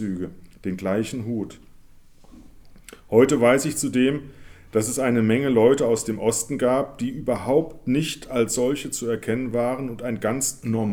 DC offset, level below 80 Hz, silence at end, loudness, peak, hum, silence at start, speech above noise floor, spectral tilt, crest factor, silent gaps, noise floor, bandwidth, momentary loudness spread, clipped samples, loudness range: under 0.1%; -50 dBFS; 0 s; -23 LUFS; -4 dBFS; none; 0 s; 25 dB; -5 dB/octave; 20 dB; none; -48 dBFS; 19 kHz; 11 LU; under 0.1%; 4 LU